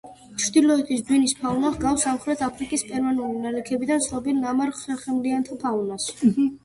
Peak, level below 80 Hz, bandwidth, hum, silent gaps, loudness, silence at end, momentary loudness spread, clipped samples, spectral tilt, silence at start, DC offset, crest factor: -6 dBFS; -52 dBFS; 11.5 kHz; none; none; -23 LUFS; 0.1 s; 7 LU; under 0.1%; -4 dB/octave; 0.05 s; under 0.1%; 16 dB